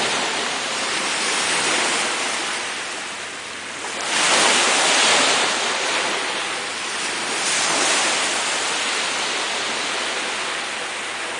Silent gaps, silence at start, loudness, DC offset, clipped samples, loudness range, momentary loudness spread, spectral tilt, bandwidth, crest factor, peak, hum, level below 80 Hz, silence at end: none; 0 s; -19 LUFS; under 0.1%; under 0.1%; 4 LU; 11 LU; 0.5 dB/octave; 11 kHz; 18 dB; -4 dBFS; none; -70 dBFS; 0 s